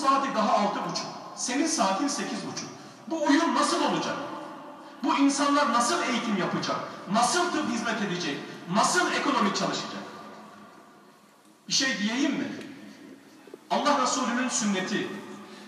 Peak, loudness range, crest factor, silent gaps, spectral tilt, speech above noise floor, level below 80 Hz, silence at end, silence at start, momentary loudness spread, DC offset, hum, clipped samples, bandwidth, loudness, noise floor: -8 dBFS; 5 LU; 20 dB; none; -3 dB/octave; 30 dB; -84 dBFS; 0 s; 0 s; 17 LU; under 0.1%; none; under 0.1%; 13.5 kHz; -26 LUFS; -57 dBFS